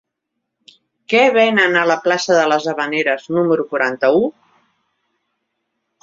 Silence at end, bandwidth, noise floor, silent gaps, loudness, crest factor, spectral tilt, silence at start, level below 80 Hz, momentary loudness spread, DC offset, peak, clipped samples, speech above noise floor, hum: 1.75 s; 7.8 kHz; -77 dBFS; none; -15 LUFS; 16 dB; -4 dB/octave; 1.1 s; -64 dBFS; 6 LU; under 0.1%; -2 dBFS; under 0.1%; 62 dB; none